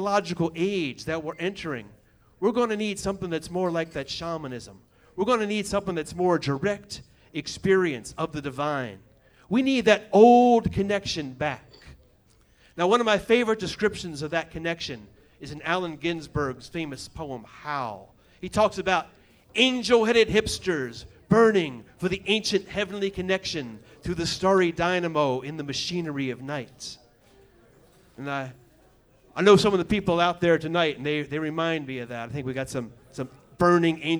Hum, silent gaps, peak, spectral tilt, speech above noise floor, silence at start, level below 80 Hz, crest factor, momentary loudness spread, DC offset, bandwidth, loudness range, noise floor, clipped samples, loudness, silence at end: none; none; -4 dBFS; -5 dB/octave; 35 dB; 0 s; -52 dBFS; 22 dB; 17 LU; under 0.1%; over 20 kHz; 9 LU; -60 dBFS; under 0.1%; -25 LUFS; 0 s